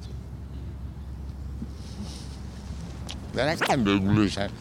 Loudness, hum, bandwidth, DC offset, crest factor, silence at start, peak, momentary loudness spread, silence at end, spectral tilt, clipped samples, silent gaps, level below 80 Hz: -29 LUFS; none; 16 kHz; under 0.1%; 20 dB; 0 s; -8 dBFS; 16 LU; 0 s; -6 dB/octave; under 0.1%; none; -40 dBFS